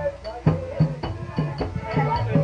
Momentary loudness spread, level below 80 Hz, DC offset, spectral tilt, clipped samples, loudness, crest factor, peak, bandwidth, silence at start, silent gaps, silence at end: 6 LU; -40 dBFS; under 0.1%; -9 dB/octave; under 0.1%; -25 LUFS; 16 dB; -6 dBFS; 7 kHz; 0 s; none; 0 s